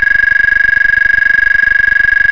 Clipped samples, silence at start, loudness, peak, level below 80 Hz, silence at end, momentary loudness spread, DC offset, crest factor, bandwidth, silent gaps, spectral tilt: under 0.1%; 0 s; -7 LUFS; 0 dBFS; -32 dBFS; 0 s; 0 LU; under 0.1%; 8 dB; 5.4 kHz; none; -3 dB/octave